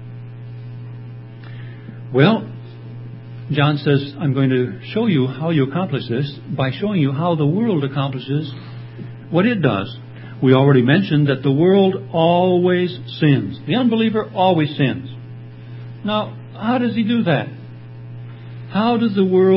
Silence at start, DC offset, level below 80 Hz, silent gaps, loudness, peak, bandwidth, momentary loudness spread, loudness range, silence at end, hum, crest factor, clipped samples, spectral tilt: 0 s; under 0.1%; -56 dBFS; none; -18 LUFS; 0 dBFS; 5.8 kHz; 20 LU; 6 LU; 0 s; none; 18 dB; under 0.1%; -11.5 dB/octave